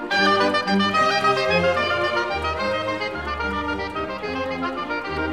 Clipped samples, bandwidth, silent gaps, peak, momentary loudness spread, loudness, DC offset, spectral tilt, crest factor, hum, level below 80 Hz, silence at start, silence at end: under 0.1%; 15.5 kHz; none; -6 dBFS; 8 LU; -22 LUFS; 0.2%; -4.5 dB/octave; 16 dB; none; -44 dBFS; 0 s; 0 s